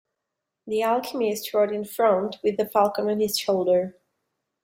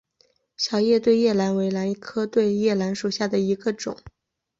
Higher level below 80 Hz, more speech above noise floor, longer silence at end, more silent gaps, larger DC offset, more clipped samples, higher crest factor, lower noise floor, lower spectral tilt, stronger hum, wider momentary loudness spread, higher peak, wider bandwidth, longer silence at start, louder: second, -70 dBFS vs -62 dBFS; first, 60 dB vs 43 dB; first, 0.7 s vs 0.5 s; neither; neither; neither; about the same, 18 dB vs 16 dB; first, -83 dBFS vs -65 dBFS; about the same, -4.5 dB/octave vs -5.5 dB/octave; neither; second, 5 LU vs 9 LU; about the same, -8 dBFS vs -8 dBFS; first, 16.5 kHz vs 7.8 kHz; about the same, 0.65 s vs 0.6 s; about the same, -24 LUFS vs -23 LUFS